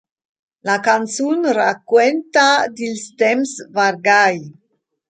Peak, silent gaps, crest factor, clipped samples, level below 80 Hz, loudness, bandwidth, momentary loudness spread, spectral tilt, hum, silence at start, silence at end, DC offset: -2 dBFS; none; 16 dB; under 0.1%; -72 dBFS; -16 LUFS; 9.4 kHz; 9 LU; -3 dB/octave; none; 0.65 s; 0.6 s; under 0.1%